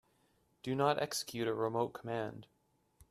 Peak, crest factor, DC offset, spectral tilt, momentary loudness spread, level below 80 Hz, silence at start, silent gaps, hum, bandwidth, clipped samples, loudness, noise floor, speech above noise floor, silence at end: -16 dBFS; 22 dB; under 0.1%; -4.5 dB/octave; 12 LU; -74 dBFS; 0.65 s; none; none; 14 kHz; under 0.1%; -36 LUFS; -74 dBFS; 38 dB; 0.05 s